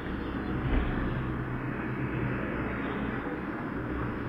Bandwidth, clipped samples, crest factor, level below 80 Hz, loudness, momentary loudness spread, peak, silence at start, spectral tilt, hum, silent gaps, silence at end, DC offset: 5.6 kHz; under 0.1%; 16 dB; -38 dBFS; -33 LUFS; 4 LU; -16 dBFS; 0 s; -9 dB/octave; none; none; 0 s; under 0.1%